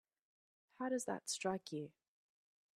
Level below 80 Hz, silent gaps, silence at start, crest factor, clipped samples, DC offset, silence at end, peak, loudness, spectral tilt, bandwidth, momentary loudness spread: -88 dBFS; none; 0.8 s; 20 dB; under 0.1%; under 0.1%; 0.85 s; -26 dBFS; -43 LUFS; -3.5 dB/octave; 14.5 kHz; 8 LU